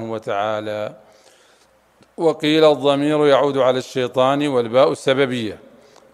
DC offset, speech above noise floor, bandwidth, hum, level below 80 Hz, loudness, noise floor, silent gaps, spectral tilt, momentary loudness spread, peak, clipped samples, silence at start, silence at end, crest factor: under 0.1%; 38 dB; 13 kHz; none; -66 dBFS; -18 LUFS; -55 dBFS; none; -5.5 dB/octave; 11 LU; -2 dBFS; under 0.1%; 0 s; 0.55 s; 18 dB